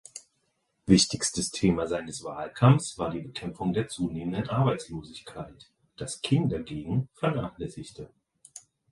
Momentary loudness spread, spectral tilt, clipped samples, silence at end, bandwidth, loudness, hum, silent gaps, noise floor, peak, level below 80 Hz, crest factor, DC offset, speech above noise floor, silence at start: 23 LU; -5.5 dB/octave; under 0.1%; 0.35 s; 11.5 kHz; -28 LUFS; none; none; -75 dBFS; -4 dBFS; -52 dBFS; 24 dB; under 0.1%; 47 dB; 0.15 s